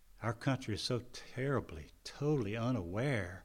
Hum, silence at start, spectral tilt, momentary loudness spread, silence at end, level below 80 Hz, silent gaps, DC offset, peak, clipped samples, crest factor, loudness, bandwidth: none; 0.2 s; -6 dB/octave; 12 LU; 0 s; -60 dBFS; none; under 0.1%; -20 dBFS; under 0.1%; 18 dB; -37 LUFS; 15.5 kHz